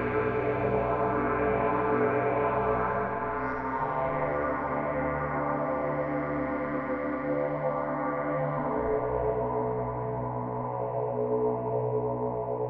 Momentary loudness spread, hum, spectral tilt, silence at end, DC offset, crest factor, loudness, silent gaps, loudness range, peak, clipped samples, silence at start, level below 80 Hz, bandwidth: 5 LU; none; -7.5 dB/octave; 0 s; under 0.1%; 16 dB; -29 LUFS; none; 3 LU; -14 dBFS; under 0.1%; 0 s; -48 dBFS; 4.6 kHz